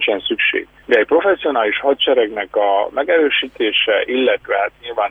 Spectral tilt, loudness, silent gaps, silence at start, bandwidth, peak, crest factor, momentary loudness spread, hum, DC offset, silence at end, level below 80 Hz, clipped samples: -4.5 dB/octave; -16 LUFS; none; 0 s; 4.9 kHz; -2 dBFS; 14 dB; 5 LU; none; under 0.1%; 0 s; -54 dBFS; under 0.1%